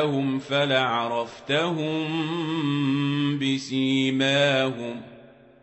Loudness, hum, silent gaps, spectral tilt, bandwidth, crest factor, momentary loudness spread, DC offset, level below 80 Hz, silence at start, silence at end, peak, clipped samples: -24 LUFS; none; none; -5.5 dB/octave; 8.4 kHz; 16 dB; 7 LU; under 0.1%; -68 dBFS; 0 s; 0.4 s; -8 dBFS; under 0.1%